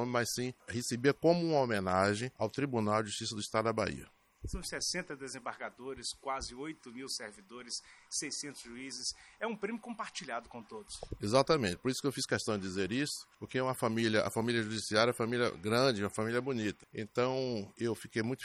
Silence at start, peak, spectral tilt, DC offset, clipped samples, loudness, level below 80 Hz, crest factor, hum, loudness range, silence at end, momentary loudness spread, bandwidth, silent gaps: 0 s; -12 dBFS; -4 dB/octave; under 0.1%; under 0.1%; -35 LUFS; -60 dBFS; 22 dB; none; 8 LU; 0 s; 13 LU; 15 kHz; none